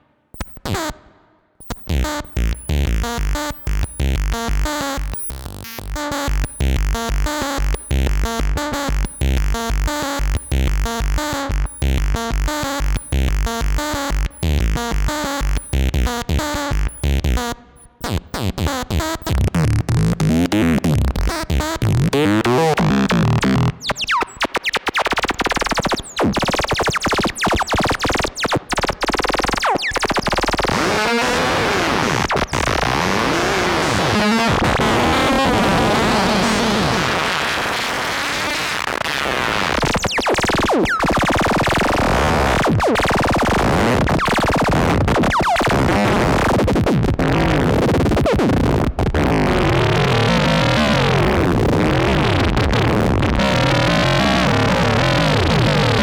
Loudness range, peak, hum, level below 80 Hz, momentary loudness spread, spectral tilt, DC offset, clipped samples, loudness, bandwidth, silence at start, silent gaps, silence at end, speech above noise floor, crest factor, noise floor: 6 LU; -6 dBFS; none; -24 dBFS; 7 LU; -5 dB/octave; under 0.1%; under 0.1%; -18 LUFS; over 20 kHz; 0.35 s; none; 0 s; 34 dB; 12 dB; -54 dBFS